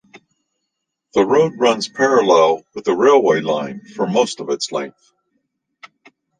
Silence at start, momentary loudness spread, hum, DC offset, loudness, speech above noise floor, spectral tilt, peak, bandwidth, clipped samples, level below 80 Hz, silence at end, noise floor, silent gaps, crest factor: 0.15 s; 11 LU; none; under 0.1%; -16 LUFS; 61 dB; -4.5 dB/octave; -2 dBFS; 9.6 kHz; under 0.1%; -62 dBFS; 1.5 s; -77 dBFS; none; 16 dB